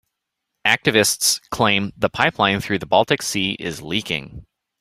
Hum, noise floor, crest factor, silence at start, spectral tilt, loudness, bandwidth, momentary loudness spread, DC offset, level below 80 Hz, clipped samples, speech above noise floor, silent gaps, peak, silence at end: none; -79 dBFS; 20 dB; 0.65 s; -3 dB/octave; -19 LUFS; 16 kHz; 9 LU; under 0.1%; -50 dBFS; under 0.1%; 59 dB; none; 0 dBFS; 0.4 s